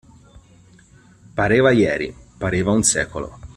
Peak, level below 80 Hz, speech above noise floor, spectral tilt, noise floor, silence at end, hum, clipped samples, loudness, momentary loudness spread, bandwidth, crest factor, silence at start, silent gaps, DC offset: -2 dBFS; -44 dBFS; 32 dB; -4.5 dB/octave; -50 dBFS; 0.05 s; none; under 0.1%; -18 LUFS; 15 LU; 14 kHz; 18 dB; 1.35 s; none; under 0.1%